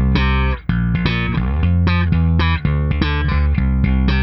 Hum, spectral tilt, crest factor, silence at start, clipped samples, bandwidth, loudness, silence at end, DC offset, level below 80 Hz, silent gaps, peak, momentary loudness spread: none; -9 dB/octave; 14 dB; 0 s; under 0.1%; 6 kHz; -17 LUFS; 0 s; under 0.1%; -20 dBFS; none; -2 dBFS; 3 LU